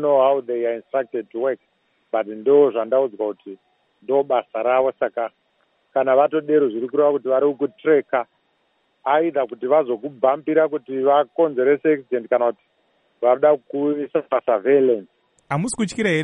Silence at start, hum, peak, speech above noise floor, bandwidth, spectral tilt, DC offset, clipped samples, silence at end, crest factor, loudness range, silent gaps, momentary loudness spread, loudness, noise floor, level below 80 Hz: 0 s; none; -4 dBFS; 47 dB; 10.5 kHz; -6 dB/octave; under 0.1%; under 0.1%; 0 s; 16 dB; 2 LU; none; 9 LU; -20 LUFS; -66 dBFS; -66 dBFS